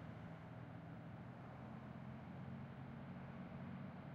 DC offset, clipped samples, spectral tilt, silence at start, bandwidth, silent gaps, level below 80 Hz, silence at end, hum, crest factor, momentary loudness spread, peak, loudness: under 0.1%; under 0.1%; -7.5 dB/octave; 0 s; 7.4 kHz; none; -72 dBFS; 0 s; none; 12 dB; 3 LU; -40 dBFS; -54 LUFS